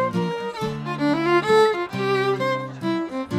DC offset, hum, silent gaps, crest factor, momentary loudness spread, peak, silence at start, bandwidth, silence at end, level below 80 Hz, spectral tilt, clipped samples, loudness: under 0.1%; none; none; 16 dB; 10 LU; -6 dBFS; 0 s; 15 kHz; 0 s; -58 dBFS; -6 dB/octave; under 0.1%; -22 LUFS